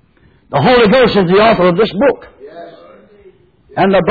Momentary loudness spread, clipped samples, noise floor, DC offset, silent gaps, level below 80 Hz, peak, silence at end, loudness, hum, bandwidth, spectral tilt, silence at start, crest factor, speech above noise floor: 17 LU; under 0.1%; -49 dBFS; under 0.1%; none; -40 dBFS; -2 dBFS; 0 s; -10 LUFS; none; 4.9 kHz; -8.5 dB/octave; 0.5 s; 10 dB; 40 dB